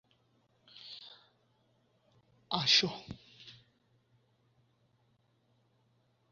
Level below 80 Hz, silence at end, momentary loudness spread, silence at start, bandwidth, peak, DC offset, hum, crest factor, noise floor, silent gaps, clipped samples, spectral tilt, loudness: -72 dBFS; 2.8 s; 28 LU; 0.85 s; 7.2 kHz; -14 dBFS; under 0.1%; none; 28 dB; -73 dBFS; none; under 0.1%; -1 dB/octave; -28 LUFS